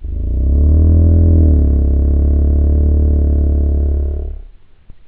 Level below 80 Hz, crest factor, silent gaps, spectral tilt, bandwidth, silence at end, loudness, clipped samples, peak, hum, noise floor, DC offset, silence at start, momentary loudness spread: -12 dBFS; 12 dB; none; -14.5 dB/octave; 1.2 kHz; 0.15 s; -13 LUFS; under 0.1%; 0 dBFS; none; -37 dBFS; under 0.1%; 0 s; 9 LU